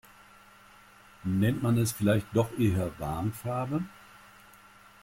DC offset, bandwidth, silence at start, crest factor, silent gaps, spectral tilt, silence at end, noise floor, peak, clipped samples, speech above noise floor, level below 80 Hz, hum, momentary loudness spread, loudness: under 0.1%; 16.5 kHz; 1.25 s; 16 dB; none; -6.5 dB/octave; 1.1 s; -55 dBFS; -14 dBFS; under 0.1%; 27 dB; -56 dBFS; none; 7 LU; -29 LUFS